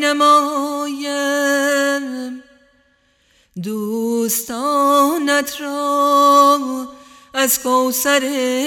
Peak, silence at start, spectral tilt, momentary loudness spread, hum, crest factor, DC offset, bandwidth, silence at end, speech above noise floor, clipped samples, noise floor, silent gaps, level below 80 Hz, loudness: -2 dBFS; 0 s; -2 dB/octave; 15 LU; none; 16 dB; under 0.1%; 18 kHz; 0 s; 43 dB; under 0.1%; -59 dBFS; none; -64 dBFS; -16 LUFS